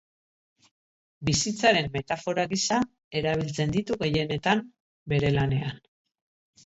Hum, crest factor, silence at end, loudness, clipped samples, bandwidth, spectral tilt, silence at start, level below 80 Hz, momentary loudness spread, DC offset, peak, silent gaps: none; 20 dB; 0.9 s; -26 LUFS; under 0.1%; 8.2 kHz; -4.5 dB/octave; 1.2 s; -52 dBFS; 8 LU; under 0.1%; -8 dBFS; 3.04-3.11 s, 4.80-5.06 s